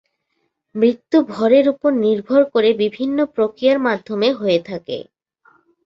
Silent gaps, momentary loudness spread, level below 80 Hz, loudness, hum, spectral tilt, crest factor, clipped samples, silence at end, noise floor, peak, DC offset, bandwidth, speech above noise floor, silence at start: none; 10 LU; -64 dBFS; -17 LUFS; none; -7 dB/octave; 16 dB; under 0.1%; 0.85 s; -71 dBFS; -2 dBFS; under 0.1%; 7.6 kHz; 54 dB; 0.75 s